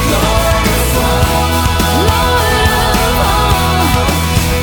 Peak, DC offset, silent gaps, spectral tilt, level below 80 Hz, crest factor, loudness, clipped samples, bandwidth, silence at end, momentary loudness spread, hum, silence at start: 0 dBFS; under 0.1%; none; -4.5 dB/octave; -18 dBFS; 10 dB; -11 LUFS; under 0.1%; over 20 kHz; 0 s; 1 LU; none; 0 s